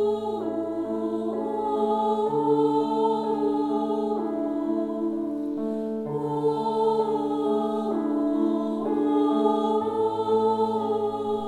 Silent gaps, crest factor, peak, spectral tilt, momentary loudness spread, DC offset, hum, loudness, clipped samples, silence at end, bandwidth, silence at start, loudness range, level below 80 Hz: none; 14 dB; -10 dBFS; -8 dB/octave; 6 LU; under 0.1%; none; -25 LUFS; under 0.1%; 0 s; 9.8 kHz; 0 s; 3 LU; -64 dBFS